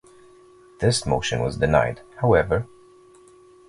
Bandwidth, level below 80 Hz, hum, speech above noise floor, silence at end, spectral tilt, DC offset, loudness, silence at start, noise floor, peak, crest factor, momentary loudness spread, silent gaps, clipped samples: 11.5 kHz; -40 dBFS; none; 30 dB; 1.05 s; -5 dB/octave; under 0.1%; -22 LUFS; 0.8 s; -51 dBFS; -2 dBFS; 22 dB; 7 LU; none; under 0.1%